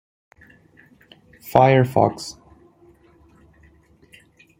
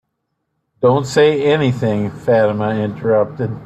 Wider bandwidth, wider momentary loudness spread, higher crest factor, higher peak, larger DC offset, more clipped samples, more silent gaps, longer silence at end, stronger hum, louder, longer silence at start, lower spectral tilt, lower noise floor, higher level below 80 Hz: first, 16.5 kHz vs 11 kHz; first, 20 LU vs 7 LU; first, 24 dB vs 16 dB; about the same, 0 dBFS vs 0 dBFS; neither; neither; neither; first, 2.3 s vs 0 s; neither; about the same, -17 LUFS vs -16 LUFS; first, 1.45 s vs 0.8 s; about the same, -7 dB/octave vs -6.5 dB/octave; second, -54 dBFS vs -72 dBFS; about the same, -56 dBFS vs -52 dBFS